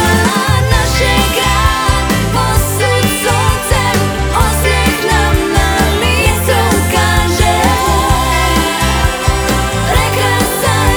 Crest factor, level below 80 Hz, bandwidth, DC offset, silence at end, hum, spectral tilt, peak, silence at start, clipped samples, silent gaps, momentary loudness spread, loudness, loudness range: 12 dB; -18 dBFS; over 20 kHz; under 0.1%; 0 s; none; -4 dB/octave; 0 dBFS; 0 s; under 0.1%; none; 2 LU; -12 LUFS; 1 LU